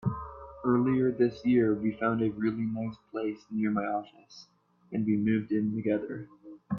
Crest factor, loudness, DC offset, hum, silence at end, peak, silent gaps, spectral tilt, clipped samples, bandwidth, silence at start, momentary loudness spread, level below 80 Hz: 16 dB; -30 LUFS; under 0.1%; none; 0 s; -14 dBFS; none; -9 dB/octave; under 0.1%; 6.2 kHz; 0 s; 13 LU; -60 dBFS